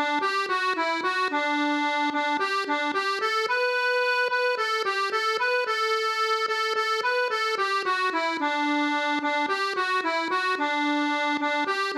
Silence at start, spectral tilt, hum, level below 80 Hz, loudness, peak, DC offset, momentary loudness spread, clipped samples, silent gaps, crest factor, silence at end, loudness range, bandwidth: 0 s; -1 dB/octave; none; -86 dBFS; -24 LUFS; -14 dBFS; under 0.1%; 2 LU; under 0.1%; none; 12 dB; 0 s; 1 LU; 15 kHz